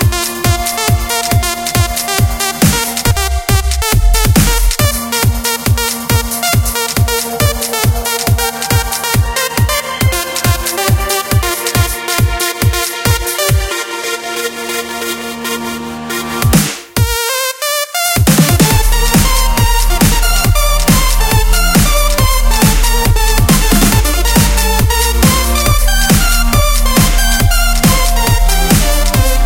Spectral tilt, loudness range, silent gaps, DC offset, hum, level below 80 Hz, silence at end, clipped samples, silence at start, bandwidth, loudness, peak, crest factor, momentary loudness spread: -3.5 dB/octave; 4 LU; none; under 0.1%; none; -14 dBFS; 0 s; under 0.1%; 0 s; 17.5 kHz; -12 LUFS; 0 dBFS; 12 dB; 5 LU